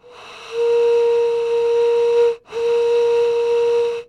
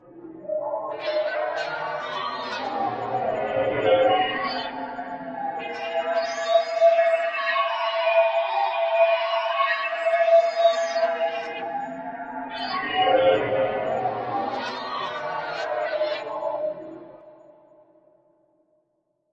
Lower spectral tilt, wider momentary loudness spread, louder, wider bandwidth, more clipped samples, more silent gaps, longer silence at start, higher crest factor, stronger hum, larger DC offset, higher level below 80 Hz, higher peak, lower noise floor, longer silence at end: second, -2.5 dB/octave vs -4 dB/octave; second, 5 LU vs 12 LU; first, -17 LUFS vs -24 LUFS; about the same, 8.4 kHz vs 8 kHz; neither; neither; first, 0.2 s vs 0.05 s; second, 10 dB vs 18 dB; neither; neither; about the same, -62 dBFS vs -66 dBFS; about the same, -8 dBFS vs -8 dBFS; second, -38 dBFS vs -73 dBFS; second, 0.05 s vs 2 s